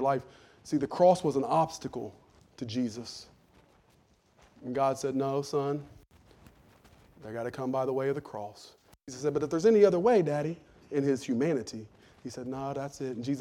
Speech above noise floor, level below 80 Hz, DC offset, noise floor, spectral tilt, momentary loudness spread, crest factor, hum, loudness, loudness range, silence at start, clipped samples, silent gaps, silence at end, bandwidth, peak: 36 dB; -66 dBFS; under 0.1%; -65 dBFS; -6.5 dB/octave; 20 LU; 20 dB; none; -29 LUFS; 9 LU; 0 s; under 0.1%; none; 0 s; 13.5 kHz; -10 dBFS